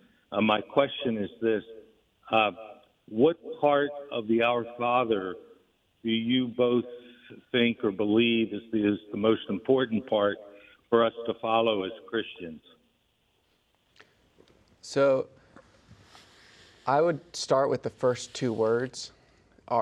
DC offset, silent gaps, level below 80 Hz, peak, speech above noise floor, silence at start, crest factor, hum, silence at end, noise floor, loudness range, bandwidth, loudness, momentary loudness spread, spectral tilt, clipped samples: under 0.1%; none; -70 dBFS; -8 dBFS; 44 dB; 0.3 s; 20 dB; none; 0 s; -71 dBFS; 6 LU; 10.5 kHz; -27 LUFS; 12 LU; -5.5 dB/octave; under 0.1%